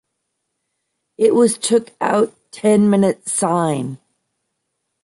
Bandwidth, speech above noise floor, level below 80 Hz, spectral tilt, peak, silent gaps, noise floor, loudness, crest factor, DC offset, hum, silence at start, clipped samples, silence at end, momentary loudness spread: 11.5 kHz; 59 dB; -64 dBFS; -5 dB/octave; -2 dBFS; none; -75 dBFS; -17 LUFS; 16 dB; under 0.1%; none; 1.2 s; under 0.1%; 1.1 s; 8 LU